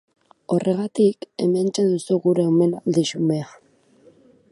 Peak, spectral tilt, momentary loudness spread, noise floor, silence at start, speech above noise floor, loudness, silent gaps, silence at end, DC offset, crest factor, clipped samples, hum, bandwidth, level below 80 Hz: -6 dBFS; -6.5 dB/octave; 6 LU; -54 dBFS; 0.5 s; 34 dB; -21 LUFS; none; 1.05 s; under 0.1%; 16 dB; under 0.1%; none; 11.5 kHz; -70 dBFS